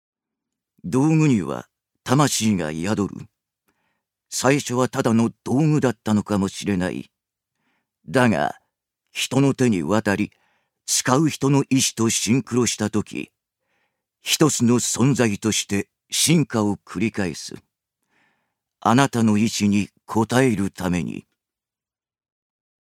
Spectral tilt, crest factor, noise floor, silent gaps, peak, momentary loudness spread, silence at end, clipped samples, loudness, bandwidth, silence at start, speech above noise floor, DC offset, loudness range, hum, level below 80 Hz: -4.5 dB/octave; 22 dB; under -90 dBFS; none; 0 dBFS; 12 LU; 1.75 s; under 0.1%; -21 LUFS; 16.5 kHz; 0.85 s; over 70 dB; under 0.1%; 4 LU; none; -58 dBFS